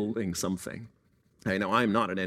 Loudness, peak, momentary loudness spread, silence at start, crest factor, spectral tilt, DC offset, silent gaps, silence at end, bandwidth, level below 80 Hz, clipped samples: -29 LUFS; -10 dBFS; 14 LU; 0 s; 20 dB; -5 dB/octave; under 0.1%; none; 0 s; 16 kHz; -62 dBFS; under 0.1%